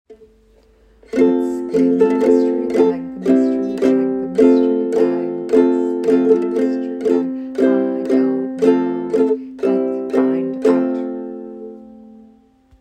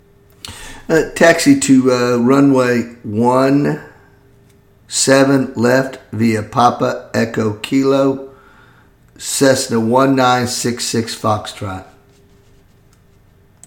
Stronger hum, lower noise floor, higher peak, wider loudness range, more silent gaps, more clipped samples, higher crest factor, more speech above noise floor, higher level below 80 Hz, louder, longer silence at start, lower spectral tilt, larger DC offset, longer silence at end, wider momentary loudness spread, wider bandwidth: neither; about the same, -51 dBFS vs -49 dBFS; about the same, 0 dBFS vs 0 dBFS; about the same, 4 LU vs 4 LU; neither; neither; about the same, 16 dB vs 16 dB; about the same, 36 dB vs 35 dB; second, -56 dBFS vs -48 dBFS; second, -17 LUFS vs -14 LUFS; second, 0.1 s vs 0.45 s; first, -7.5 dB/octave vs -4.5 dB/octave; neither; second, 0.7 s vs 1.85 s; second, 8 LU vs 15 LU; second, 9 kHz vs 17.5 kHz